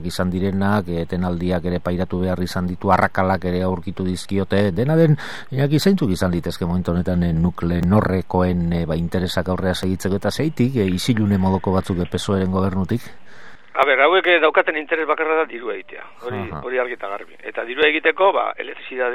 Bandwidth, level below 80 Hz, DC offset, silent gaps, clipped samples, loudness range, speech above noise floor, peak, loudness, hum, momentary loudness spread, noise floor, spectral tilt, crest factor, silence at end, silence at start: 15 kHz; -42 dBFS; 2%; none; under 0.1%; 3 LU; 23 dB; 0 dBFS; -20 LUFS; none; 11 LU; -42 dBFS; -6.5 dB/octave; 20 dB; 0 s; 0 s